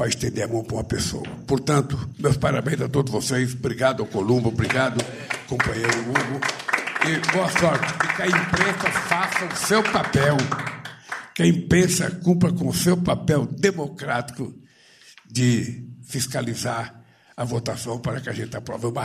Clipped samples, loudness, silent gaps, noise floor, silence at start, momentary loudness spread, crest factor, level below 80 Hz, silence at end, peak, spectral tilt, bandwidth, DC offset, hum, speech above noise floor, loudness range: under 0.1%; -23 LUFS; none; -52 dBFS; 0 s; 11 LU; 18 dB; -48 dBFS; 0 s; -4 dBFS; -5 dB/octave; 15.5 kHz; under 0.1%; none; 29 dB; 6 LU